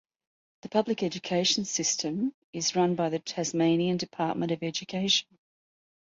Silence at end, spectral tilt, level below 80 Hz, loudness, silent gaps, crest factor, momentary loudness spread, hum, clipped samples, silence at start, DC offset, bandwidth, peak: 0.9 s; -3.5 dB/octave; -70 dBFS; -28 LUFS; 2.34-2.53 s; 18 dB; 6 LU; none; under 0.1%; 0.65 s; under 0.1%; 7.8 kHz; -12 dBFS